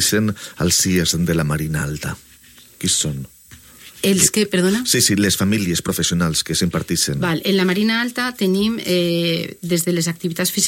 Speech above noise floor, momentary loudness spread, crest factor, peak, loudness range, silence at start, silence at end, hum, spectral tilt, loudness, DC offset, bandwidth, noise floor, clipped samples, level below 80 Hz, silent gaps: 28 dB; 9 LU; 18 dB; 0 dBFS; 3 LU; 0 s; 0 s; none; -3.5 dB/octave; -18 LUFS; under 0.1%; 16.5 kHz; -46 dBFS; under 0.1%; -44 dBFS; none